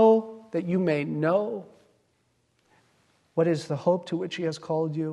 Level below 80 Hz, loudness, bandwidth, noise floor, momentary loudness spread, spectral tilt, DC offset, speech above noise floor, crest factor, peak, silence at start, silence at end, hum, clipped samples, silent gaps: -74 dBFS; -27 LUFS; 11 kHz; -70 dBFS; 8 LU; -7.5 dB/octave; under 0.1%; 44 dB; 18 dB; -10 dBFS; 0 s; 0 s; none; under 0.1%; none